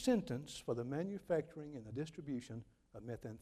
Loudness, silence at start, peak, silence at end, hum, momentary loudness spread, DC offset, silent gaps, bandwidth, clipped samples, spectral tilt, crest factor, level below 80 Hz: -43 LUFS; 0 s; -22 dBFS; 0 s; none; 13 LU; under 0.1%; none; 14 kHz; under 0.1%; -6 dB/octave; 20 dB; -68 dBFS